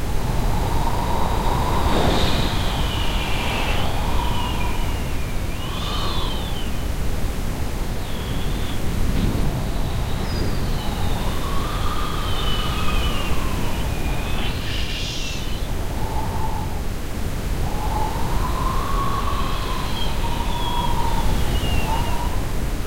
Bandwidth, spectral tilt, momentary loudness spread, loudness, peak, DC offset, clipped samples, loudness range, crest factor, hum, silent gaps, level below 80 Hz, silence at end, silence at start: 16 kHz; -5 dB/octave; 5 LU; -24 LUFS; -6 dBFS; under 0.1%; under 0.1%; 4 LU; 14 dB; none; none; -24 dBFS; 0 s; 0 s